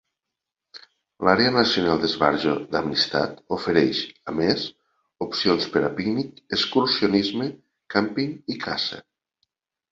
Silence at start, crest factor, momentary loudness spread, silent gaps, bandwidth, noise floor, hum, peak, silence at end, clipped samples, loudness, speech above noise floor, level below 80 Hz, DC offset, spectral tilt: 0.75 s; 22 dB; 9 LU; none; 7.8 kHz; -85 dBFS; none; -2 dBFS; 0.9 s; under 0.1%; -23 LUFS; 62 dB; -56 dBFS; under 0.1%; -5.5 dB/octave